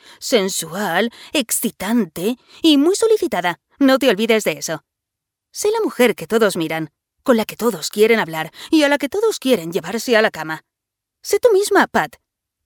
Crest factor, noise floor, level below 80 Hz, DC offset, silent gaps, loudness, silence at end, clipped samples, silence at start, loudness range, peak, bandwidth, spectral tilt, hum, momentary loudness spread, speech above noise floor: 18 dB; -82 dBFS; -60 dBFS; under 0.1%; none; -18 LUFS; 0.55 s; under 0.1%; 0.2 s; 2 LU; 0 dBFS; over 20 kHz; -3.5 dB/octave; none; 11 LU; 65 dB